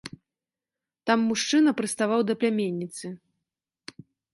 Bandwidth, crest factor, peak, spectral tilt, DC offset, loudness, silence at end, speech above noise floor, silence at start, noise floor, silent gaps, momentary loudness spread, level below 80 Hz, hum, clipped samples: 11.5 kHz; 20 dB; -8 dBFS; -4 dB/octave; under 0.1%; -25 LUFS; 1.15 s; over 66 dB; 0.05 s; under -90 dBFS; none; 24 LU; -72 dBFS; none; under 0.1%